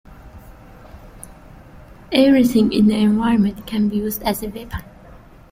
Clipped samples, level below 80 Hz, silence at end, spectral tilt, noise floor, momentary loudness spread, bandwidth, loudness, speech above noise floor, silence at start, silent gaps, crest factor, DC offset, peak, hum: under 0.1%; -42 dBFS; 0.7 s; -6 dB/octave; -43 dBFS; 18 LU; 16.5 kHz; -17 LUFS; 26 dB; 0.1 s; none; 18 dB; under 0.1%; -2 dBFS; none